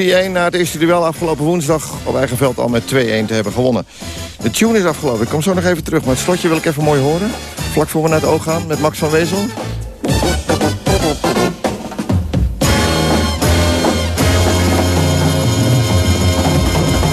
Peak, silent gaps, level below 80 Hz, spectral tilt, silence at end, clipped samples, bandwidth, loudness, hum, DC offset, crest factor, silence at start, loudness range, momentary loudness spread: -2 dBFS; none; -26 dBFS; -5 dB/octave; 0 s; under 0.1%; 14 kHz; -15 LUFS; none; under 0.1%; 12 dB; 0 s; 3 LU; 6 LU